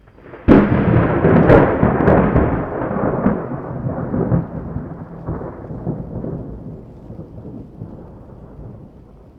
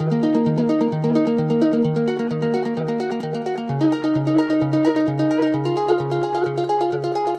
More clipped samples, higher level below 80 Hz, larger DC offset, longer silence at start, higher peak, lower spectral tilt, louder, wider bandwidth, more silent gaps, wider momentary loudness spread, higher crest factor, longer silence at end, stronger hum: neither; first, -32 dBFS vs -60 dBFS; neither; first, 0.25 s vs 0 s; first, 0 dBFS vs -6 dBFS; first, -11 dB/octave vs -8 dB/octave; first, -16 LUFS vs -20 LUFS; second, 5.2 kHz vs 8.8 kHz; neither; first, 23 LU vs 5 LU; about the same, 18 dB vs 14 dB; first, 0.5 s vs 0 s; neither